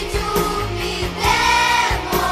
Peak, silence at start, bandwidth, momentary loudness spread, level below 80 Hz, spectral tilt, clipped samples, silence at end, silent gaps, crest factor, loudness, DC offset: -2 dBFS; 0 s; 16 kHz; 8 LU; -30 dBFS; -3 dB/octave; under 0.1%; 0 s; none; 16 dB; -18 LUFS; under 0.1%